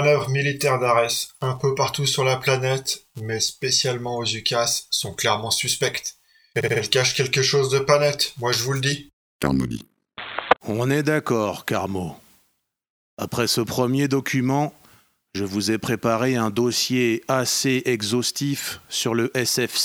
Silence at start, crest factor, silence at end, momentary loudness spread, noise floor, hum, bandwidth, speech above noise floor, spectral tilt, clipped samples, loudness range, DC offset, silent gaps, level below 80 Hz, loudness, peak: 0 s; 22 dB; 0 s; 10 LU; -70 dBFS; none; over 20 kHz; 47 dB; -3.5 dB/octave; under 0.1%; 4 LU; under 0.1%; 9.13-9.40 s, 12.90-13.17 s; -54 dBFS; -22 LUFS; 0 dBFS